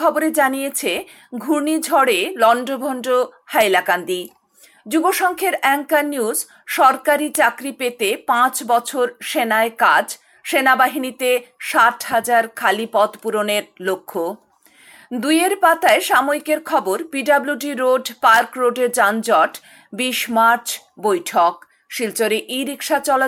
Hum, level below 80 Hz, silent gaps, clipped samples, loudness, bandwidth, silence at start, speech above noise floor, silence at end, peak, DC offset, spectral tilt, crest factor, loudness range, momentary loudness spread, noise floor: none; -68 dBFS; none; under 0.1%; -18 LUFS; 19 kHz; 0 s; 34 dB; 0 s; -2 dBFS; under 0.1%; -2 dB/octave; 16 dB; 2 LU; 10 LU; -52 dBFS